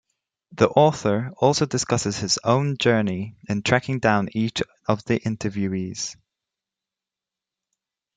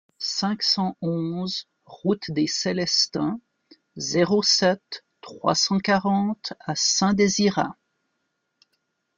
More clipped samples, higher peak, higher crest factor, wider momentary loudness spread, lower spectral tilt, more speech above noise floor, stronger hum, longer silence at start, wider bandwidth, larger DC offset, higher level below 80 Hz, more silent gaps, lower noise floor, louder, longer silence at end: neither; first, -2 dBFS vs -6 dBFS; about the same, 20 dB vs 18 dB; second, 8 LU vs 11 LU; first, -5 dB/octave vs -3.5 dB/octave; first, 67 dB vs 53 dB; neither; first, 0.5 s vs 0.2 s; first, 9.6 kHz vs 7.4 kHz; neither; about the same, -58 dBFS vs -62 dBFS; neither; first, -89 dBFS vs -76 dBFS; about the same, -22 LUFS vs -23 LUFS; first, 2.05 s vs 1.45 s